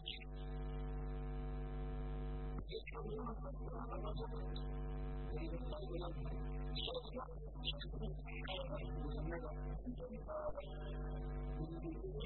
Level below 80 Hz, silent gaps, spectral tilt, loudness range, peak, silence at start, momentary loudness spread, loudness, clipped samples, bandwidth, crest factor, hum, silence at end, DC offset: -46 dBFS; none; -5 dB/octave; 1 LU; -28 dBFS; 0 s; 4 LU; -47 LUFS; under 0.1%; 4.2 kHz; 16 dB; none; 0 s; under 0.1%